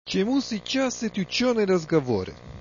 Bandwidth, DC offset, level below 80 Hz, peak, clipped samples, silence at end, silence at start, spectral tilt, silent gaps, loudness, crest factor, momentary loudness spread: 7.4 kHz; under 0.1%; -54 dBFS; -10 dBFS; under 0.1%; 0 s; 0.05 s; -5 dB/octave; none; -25 LUFS; 16 dB; 7 LU